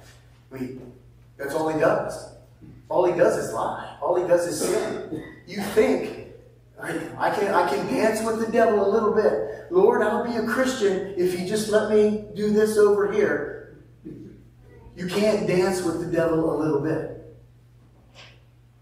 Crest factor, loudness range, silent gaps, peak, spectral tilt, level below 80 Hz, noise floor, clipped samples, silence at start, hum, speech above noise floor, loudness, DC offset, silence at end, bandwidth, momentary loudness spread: 18 dB; 4 LU; none; -4 dBFS; -5.5 dB/octave; -54 dBFS; -53 dBFS; under 0.1%; 0.5 s; none; 31 dB; -23 LUFS; under 0.1%; 0.55 s; 15.5 kHz; 16 LU